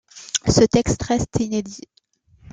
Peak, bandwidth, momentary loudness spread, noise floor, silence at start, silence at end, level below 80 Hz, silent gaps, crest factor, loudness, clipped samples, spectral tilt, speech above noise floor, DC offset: -2 dBFS; 9.6 kHz; 14 LU; -59 dBFS; 0.15 s; 0.75 s; -38 dBFS; none; 20 dB; -20 LUFS; under 0.1%; -5 dB/octave; 40 dB; under 0.1%